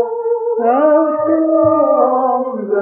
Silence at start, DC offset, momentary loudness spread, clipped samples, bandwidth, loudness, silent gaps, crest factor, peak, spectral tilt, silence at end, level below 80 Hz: 0 s; under 0.1%; 6 LU; under 0.1%; 3.1 kHz; -14 LUFS; none; 12 dB; 0 dBFS; -12 dB/octave; 0 s; -62 dBFS